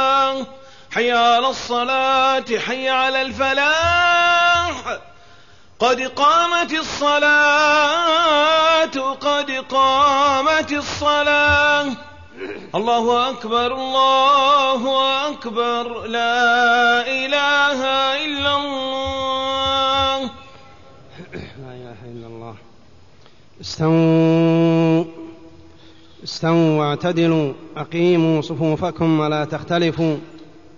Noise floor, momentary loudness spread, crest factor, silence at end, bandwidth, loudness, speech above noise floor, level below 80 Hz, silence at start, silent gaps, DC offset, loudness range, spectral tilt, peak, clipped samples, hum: -50 dBFS; 16 LU; 14 dB; 0.35 s; 7.4 kHz; -17 LUFS; 33 dB; -48 dBFS; 0 s; none; 0.5%; 6 LU; -4.5 dB/octave; -4 dBFS; under 0.1%; none